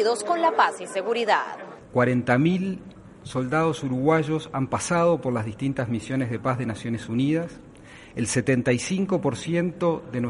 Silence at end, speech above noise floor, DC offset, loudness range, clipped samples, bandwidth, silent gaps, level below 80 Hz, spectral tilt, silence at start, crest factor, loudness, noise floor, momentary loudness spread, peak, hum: 0 s; 22 dB; under 0.1%; 2 LU; under 0.1%; 11.5 kHz; none; -56 dBFS; -5.5 dB/octave; 0 s; 20 dB; -24 LUFS; -46 dBFS; 9 LU; -6 dBFS; none